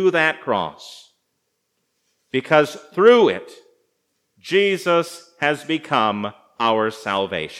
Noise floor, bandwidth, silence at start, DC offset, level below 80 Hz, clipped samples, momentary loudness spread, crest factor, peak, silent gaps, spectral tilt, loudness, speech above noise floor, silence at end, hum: -73 dBFS; 14.5 kHz; 0 s; under 0.1%; -70 dBFS; under 0.1%; 15 LU; 20 dB; 0 dBFS; none; -5 dB/octave; -19 LUFS; 54 dB; 0 s; none